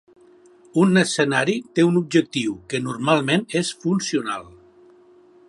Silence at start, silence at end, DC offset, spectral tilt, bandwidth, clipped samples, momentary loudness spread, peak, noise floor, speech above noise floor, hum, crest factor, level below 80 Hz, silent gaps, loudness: 0.75 s; 1 s; under 0.1%; -5 dB/octave; 11.5 kHz; under 0.1%; 9 LU; -2 dBFS; -51 dBFS; 31 dB; none; 20 dB; -64 dBFS; none; -21 LUFS